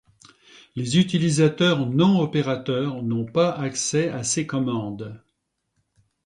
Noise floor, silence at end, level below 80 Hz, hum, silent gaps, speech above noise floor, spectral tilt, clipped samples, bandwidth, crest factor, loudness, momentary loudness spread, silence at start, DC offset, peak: -75 dBFS; 1.1 s; -60 dBFS; none; none; 54 dB; -5 dB/octave; under 0.1%; 11 kHz; 16 dB; -22 LUFS; 11 LU; 0.75 s; under 0.1%; -6 dBFS